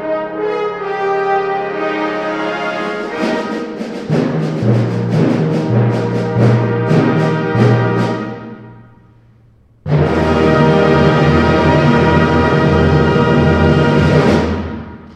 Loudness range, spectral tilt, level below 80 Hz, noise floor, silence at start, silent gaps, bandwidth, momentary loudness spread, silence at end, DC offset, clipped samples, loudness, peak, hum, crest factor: 7 LU; -8 dB/octave; -32 dBFS; -48 dBFS; 0 s; none; 9.2 kHz; 9 LU; 0 s; under 0.1%; under 0.1%; -14 LUFS; 0 dBFS; none; 14 dB